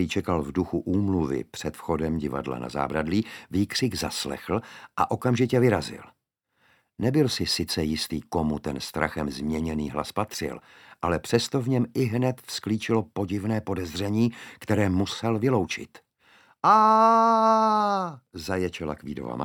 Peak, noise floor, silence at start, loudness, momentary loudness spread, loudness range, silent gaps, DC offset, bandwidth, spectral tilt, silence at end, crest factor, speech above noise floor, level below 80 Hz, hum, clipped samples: -6 dBFS; -72 dBFS; 0 s; -26 LUFS; 12 LU; 6 LU; none; under 0.1%; 18.5 kHz; -5.5 dB/octave; 0 s; 20 dB; 46 dB; -50 dBFS; none; under 0.1%